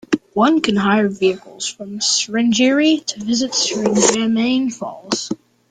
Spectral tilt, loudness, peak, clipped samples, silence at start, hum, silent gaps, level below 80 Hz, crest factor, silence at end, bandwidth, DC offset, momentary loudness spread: -3 dB/octave; -17 LUFS; 0 dBFS; under 0.1%; 0.1 s; none; none; -58 dBFS; 18 dB; 0.35 s; 9.6 kHz; under 0.1%; 11 LU